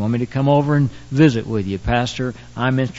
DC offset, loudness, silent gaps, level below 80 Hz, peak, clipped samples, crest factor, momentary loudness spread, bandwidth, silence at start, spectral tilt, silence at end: under 0.1%; -19 LUFS; none; -38 dBFS; -2 dBFS; under 0.1%; 16 dB; 8 LU; 8 kHz; 0 s; -7 dB/octave; 0 s